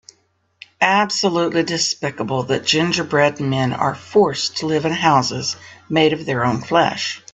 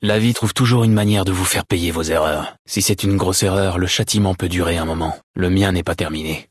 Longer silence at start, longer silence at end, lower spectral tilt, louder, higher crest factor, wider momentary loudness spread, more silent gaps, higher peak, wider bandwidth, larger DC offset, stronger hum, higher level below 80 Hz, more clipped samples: first, 0.8 s vs 0 s; about the same, 0.15 s vs 0.1 s; about the same, -4 dB/octave vs -4.5 dB/octave; about the same, -18 LUFS vs -18 LUFS; about the same, 18 dB vs 14 dB; about the same, 6 LU vs 7 LU; second, none vs 2.59-2.65 s, 5.23-5.34 s; about the same, 0 dBFS vs -2 dBFS; second, 8.4 kHz vs 12 kHz; neither; neither; second, -58 dBFS vs -40 dBFS; neither